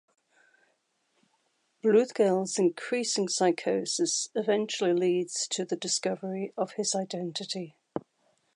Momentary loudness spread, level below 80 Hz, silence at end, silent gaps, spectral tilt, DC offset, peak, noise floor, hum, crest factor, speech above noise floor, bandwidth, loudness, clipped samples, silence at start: 10 LU; -82 dBFS; 0.55 s; none; -3.5 dB/octave; under 0.1%; -12 dBFS; -74 dBFS; none; 18 dB; 46 dB; 11.5 kHz; -28 LUFS; under 0.1%; 1.85 s